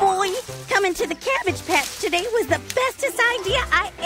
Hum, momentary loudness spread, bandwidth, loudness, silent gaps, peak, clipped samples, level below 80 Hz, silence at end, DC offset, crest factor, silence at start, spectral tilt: none; 4 LU; 16 kHz; -21 LUFS; none; -6 dBFS; under 0.1%; -44 dBFS; 0 s; under 0.1%; 16 dB; 0 s; -2.5 dB/octave